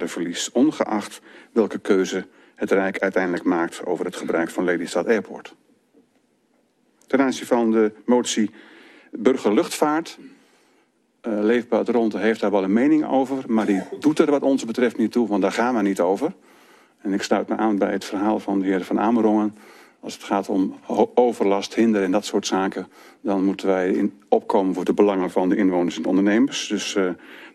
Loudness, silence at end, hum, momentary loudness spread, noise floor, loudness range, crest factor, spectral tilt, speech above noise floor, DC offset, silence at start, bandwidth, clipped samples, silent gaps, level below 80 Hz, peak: -21 LUFS; 0.05 s; none; 8 LU; -64 dBFS; 4 LU; 20 dB; -5 dB/octave; 43 dB; under 0.1%; 0 s; 13 kHz; under 0.1%; none; -68 dBFS; -2 dBFS